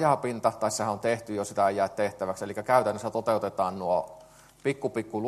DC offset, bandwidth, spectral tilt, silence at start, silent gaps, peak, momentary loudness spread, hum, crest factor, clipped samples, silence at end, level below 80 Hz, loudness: under 0.1%; 13 kHz; -5 dB/octave; 0 s; none; -8 dBFS; 8 LU; none; 20 dB; under 0.1%; 0 s; -66 dBFS; -28 LUFS